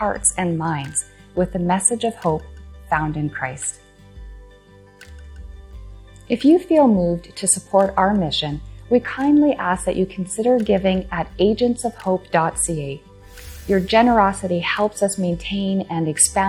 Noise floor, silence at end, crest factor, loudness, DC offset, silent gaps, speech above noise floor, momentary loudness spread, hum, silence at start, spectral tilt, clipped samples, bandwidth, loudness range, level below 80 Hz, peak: -47 dBFS; 0 s; 18 dB; -19 LUFS; under 0.1%; none; 28 dB; 12 LU; none; 0 s; -4.5 dB/octave; under 0.1%; 15 kHz; 9 LU; -40 dBFS; -2 dBFS